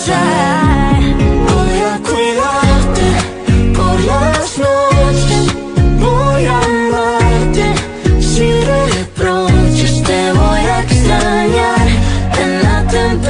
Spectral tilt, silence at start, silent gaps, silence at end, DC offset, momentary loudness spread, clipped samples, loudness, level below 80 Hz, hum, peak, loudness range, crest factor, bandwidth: -5.5 dB/octave; 0 s; none; 0 s; under 0.1%; 3 LU; under 0.1%; -12 LUFS; -18 dBFS; none; 0 dBFS; 1 LU; 10 dB; 11 kHz